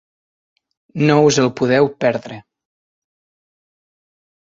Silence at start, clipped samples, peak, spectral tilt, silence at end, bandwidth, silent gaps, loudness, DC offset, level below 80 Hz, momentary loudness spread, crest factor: 0.95 s; under 0.1%; -2 dBFS; -5.5 dB/octave; 2.2 s; 7.8 kHz; none; -16 LUFS; under 0.1%; -58 dBFS; 21 LU; 18 dB